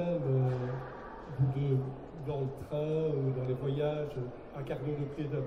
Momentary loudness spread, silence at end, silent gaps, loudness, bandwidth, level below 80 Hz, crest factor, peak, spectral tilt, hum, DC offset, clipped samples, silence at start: 11 LU; 0 s; none; -34 LUFS; 5.8 kHz; -56 dBFS; 14 dB; -20 dBFS; -9.5 dB/octave; none; under 0.1%; under 0.1%; 0 s